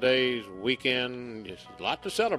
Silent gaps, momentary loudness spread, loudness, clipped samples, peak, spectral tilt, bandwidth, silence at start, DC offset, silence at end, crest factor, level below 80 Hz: none; 14 LU; -29 LUFS; under 0.1%; -12 dBFS; -4 dB/octave; 13 kHz; 0 s; under 0.1%; 0 s; 18 dB; -64 dBFS